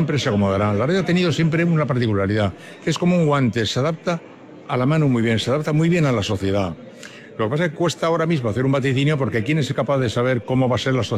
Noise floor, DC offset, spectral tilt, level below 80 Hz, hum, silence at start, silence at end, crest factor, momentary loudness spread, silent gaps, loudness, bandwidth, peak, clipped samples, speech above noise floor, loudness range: -39 dBFS; under 0.1%; -6.5 dB/octave; -54 dBFS; none; 0 s; 0 s; 12 dB; 8 LU; none; -20 LUFS; 12 kHz; -8 dBFS; under 0.1%; 20 dB; 2 LU